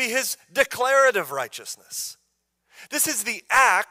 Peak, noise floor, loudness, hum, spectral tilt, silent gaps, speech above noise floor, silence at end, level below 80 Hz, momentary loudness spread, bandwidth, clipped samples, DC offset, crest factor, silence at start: -6 dBFS; -73 dBFS; -22 LUFS; none; -0.5 dB/octave; none; 50 dB; 0.05 s; -62 dBFS; 14 LU; 16 kHz; under 0.1%; under 0.1%; 18 dB; 0 s